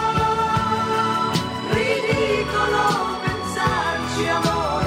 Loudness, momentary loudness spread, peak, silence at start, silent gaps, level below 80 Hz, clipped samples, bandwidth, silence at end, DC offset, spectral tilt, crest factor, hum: -21 LUFS; 4 LU; -8 dBFS; 0 s; none; -40 dBFS; under 0.1%; 16 kHz; 0 s; under 0.1%; -4.5 dB/octave; 12 dB; none